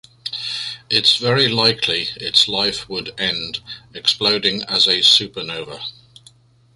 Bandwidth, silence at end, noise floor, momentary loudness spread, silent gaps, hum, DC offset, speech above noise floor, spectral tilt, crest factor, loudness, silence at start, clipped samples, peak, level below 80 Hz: 11.5 kHz; 0.85 s; -51 dBFS; 15 LU; none; none; under 0.1%; 32 dB; -2.5 dB/octave; 20 dB; -16 LUFS; 0.25 s; under 0.1%; 0 dBFS; -54 dBFS